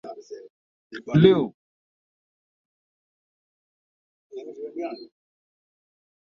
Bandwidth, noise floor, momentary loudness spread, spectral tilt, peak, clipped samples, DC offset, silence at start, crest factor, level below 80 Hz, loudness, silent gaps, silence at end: 6.6 kHz; under -90 dBFS; 25 LU; -8.5 dB/octave; -2 dBFS; under 0.1%; under 0.1%; 0.05 s; 26 dB; -64 dBFS; -22 LUFS; 0.50-0.90 s, 1.54-4.30 s; 1.25 s